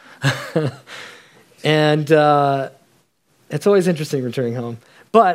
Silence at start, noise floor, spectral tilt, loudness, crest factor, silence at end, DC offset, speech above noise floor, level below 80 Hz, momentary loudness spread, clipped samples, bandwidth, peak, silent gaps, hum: 0.2 s; -60 dBFS; -6 dB/octave; -18 LUFS; 18 dB; 0 s; under 0.1%; 43 dB; -68 dBFS; 20 LU; under 0.1%; 16 kHz; 0 dBFS; none; none